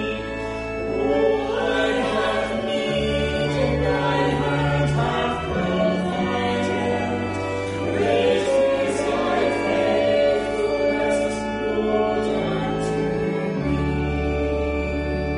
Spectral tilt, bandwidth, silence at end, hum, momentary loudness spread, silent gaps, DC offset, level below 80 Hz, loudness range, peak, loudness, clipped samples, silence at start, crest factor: -6 dB/octave; 10.5 kHz; 0 s; none; 5 LU; none; under 0.1%; -36 dBFS; 2 LU; -8 dBFS; -22 LUFS; under 0.1%; 0 s; 14 dB